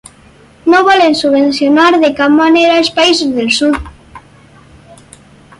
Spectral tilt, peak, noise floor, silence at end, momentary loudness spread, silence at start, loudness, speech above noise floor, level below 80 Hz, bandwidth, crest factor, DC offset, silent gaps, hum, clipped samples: -3.5 dB/octave; 0 dBFS; -42 dBFS; 1.4 s; 5 LU; 0.65 s; -9 LUFS; 33 dB; -40 dBFS; 11.5 kHz; 12 dB; under 0.1%; none; none; under 0.1%